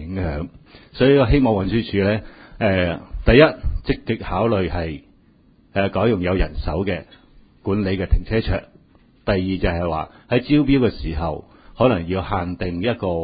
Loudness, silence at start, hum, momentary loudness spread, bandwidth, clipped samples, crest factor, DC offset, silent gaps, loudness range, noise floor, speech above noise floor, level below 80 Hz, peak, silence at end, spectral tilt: -20 LUFS; 0 s; none; 12 LU; 5 kHz; under 0.1%; 20 dB; under 0.1%; none; 6 LU; -54 dBFS; 35 dB; -30 dBFS; 0 dBFS; 0 s; -11.5 dB/octave